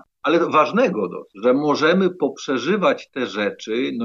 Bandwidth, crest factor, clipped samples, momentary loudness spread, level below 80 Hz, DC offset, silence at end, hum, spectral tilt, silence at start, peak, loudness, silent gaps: 7.4 kHz; 16 dB; under 0.1%; 8 LU; -72 dBFS; under 0.1%; 0 s; none; -5.5 dB/octave; 0.25 s; -4 dBFS; -20 LUFS; none